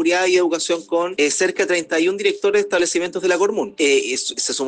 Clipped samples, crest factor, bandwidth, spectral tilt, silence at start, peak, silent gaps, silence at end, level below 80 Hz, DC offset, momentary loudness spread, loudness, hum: under 0.1%; 14 dB; 10 kHz; -2 dB/octave; 0 s; -4 dBFS; none; 0 s; -68 dBFS; under 0.1%; 4 LU; -18 LUFS; none